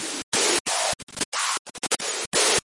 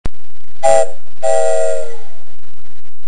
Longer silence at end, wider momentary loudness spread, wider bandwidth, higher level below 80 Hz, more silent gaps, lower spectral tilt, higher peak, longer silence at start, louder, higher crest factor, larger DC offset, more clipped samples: second, 0.05 s vs 1.1 s; second, 7 LU vs 13 LU; about the same, 11.5 kHz vs 12 kHz; second, -60 dBFS vs -32 dBFS; first, 0.23-0.32 s, 0.60-0.65 s, 1.03-1.07 s, 1.25-1.32 s, 1.59-1.65 s, 2.26-2.32 s vs none; second, 0 dB/octave vs -3.5 dB/octave; second, -8 dBFS vs 0 dBFS; about the same, 0 s vs 0.05 s; second, -23 LUFS vs -16 LUFS; about the same, 18 dB vs 18 dB; second, under 0.1% vs 50%; second, under 0.1% vs 0.3%